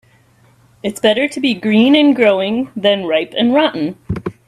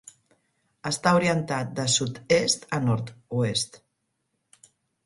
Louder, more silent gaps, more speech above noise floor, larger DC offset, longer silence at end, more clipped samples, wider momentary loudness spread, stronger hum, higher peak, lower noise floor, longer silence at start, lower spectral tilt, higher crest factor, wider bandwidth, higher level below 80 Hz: first, -14 LUFS vs -25 LUFS; neither; second, 37 dB vs 52 dB; neither; second, 0.15 s vs 1.3 s; neither; first, 13 LU vs 9 LU; neither; first, 0 dBFS vs -6 dBFS; second, -51 dBFS vs -77 dBFS; about the same, 0.85 s vs 0.85 s; first, -5.5 dB/octave vs -4 dB/octave; second, 14 dB vs 22 dB; first, 13.5 kHz vs 11.5 kHz; first, -48 dBFS vs -60 dBFS